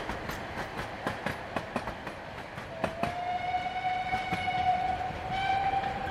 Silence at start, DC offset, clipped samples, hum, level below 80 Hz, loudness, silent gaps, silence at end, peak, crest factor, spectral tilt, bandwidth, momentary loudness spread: 0 s; under 0.1%; under 0.1%; none; -52 dBFS; -33 LUFS; none; 0 s; -14 dBFS; 18 dB; -5 dB/octave; 14 kHz; 10 LU